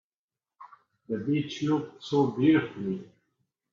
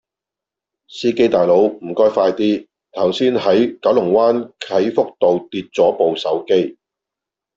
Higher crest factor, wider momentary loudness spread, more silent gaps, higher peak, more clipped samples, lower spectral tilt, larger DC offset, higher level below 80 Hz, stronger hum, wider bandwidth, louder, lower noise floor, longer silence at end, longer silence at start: about the same, 18 dB vs 14 dB; first, 11 LU vs 8 LU; neither; second, -12 dBFS vs -2 dBFS; neither; about the same, -7 dB/octave vs -6 dB/octave; neither; second, -70 dBFS vs -60 dBFS; neither; about the same, 7.2 kHz vs 7.6 kHz; second, -28 LUFS vs -16 LUFS; first, under -90 dBFS vs -86 dBFS; second, 0.7 s vs 0.85 s; second, 0.6 s vs 0.9 s